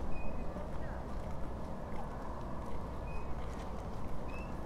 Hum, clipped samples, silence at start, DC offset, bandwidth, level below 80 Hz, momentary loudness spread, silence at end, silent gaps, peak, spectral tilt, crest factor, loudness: none; under 0.1%; 0 s; under 0.1%; 11 kHz; -44 dBFS; 1 LU; 0 s; none; -24 dBFS; -7.5 dB/octave; 14 dB; -44 LUFS